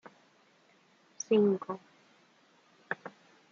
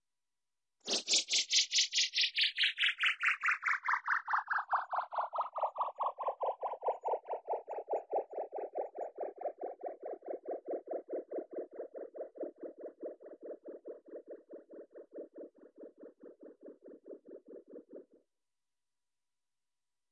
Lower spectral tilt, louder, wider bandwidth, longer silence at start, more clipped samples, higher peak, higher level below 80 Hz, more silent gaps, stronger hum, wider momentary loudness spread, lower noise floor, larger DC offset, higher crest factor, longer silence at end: first, -5.5 dB/octave vs 1.5 dB/octave; about the same, -32 LUFS vs -34 LUFS; second, 7 kHz vs 11 kHz; first, 1.3 s vs 0.85 s; neither; about the same, -16 dBFS vs -16 dBFS; about the same, -86 dBFS vs under -90 dBFS; neither; neither; second, 17 LU vs 24 LU; second, -66 dBFS vs under -90 dBFS; neither; about the same, 20 dB vs 22 dB; second, 0.4 s vs 2.1 s